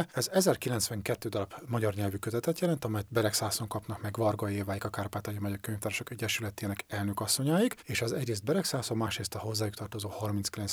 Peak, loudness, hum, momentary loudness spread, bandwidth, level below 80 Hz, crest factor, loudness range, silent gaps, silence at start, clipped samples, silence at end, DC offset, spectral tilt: -12 dBFS; -32 LUFS; none; 8 LU; over 20 kHz; -62 dBFS; 20 dB; 3 LU; none; 0 s; under 0.1%; 0 s; under 0.1%; -4.5 dB/octave